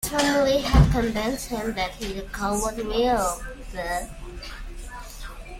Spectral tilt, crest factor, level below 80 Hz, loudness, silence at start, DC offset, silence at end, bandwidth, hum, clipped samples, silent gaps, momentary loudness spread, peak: -5 dB/octave; 20 dB; -32 dBFS; -24 LUFS; 0 s; under 0.1%; 0 s; 16.5 kHz; none; under 0.1%; none; 20 LU; -4 dBFS